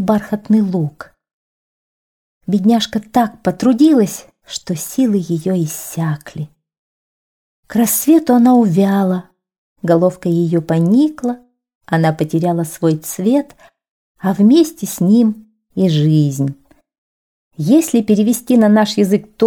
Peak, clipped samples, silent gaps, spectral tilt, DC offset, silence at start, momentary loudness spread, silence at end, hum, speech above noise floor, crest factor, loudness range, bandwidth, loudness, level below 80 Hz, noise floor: -2 dBFS; under 0.1%; 1.33-2.41 s, 6.78-7.63 s, 9.58-9.76 s, 11.75-11.81 s, 13.91-14.15 s, 16.98-17.51 s; -6.5 dB/octave; 0.1%; 0 s; 12 LU; 0 s; none; over 76 dB; 14 dB; 4 LU; 19.5 kHz; -15 LUFS; -56 dBFS; under -90 dBFS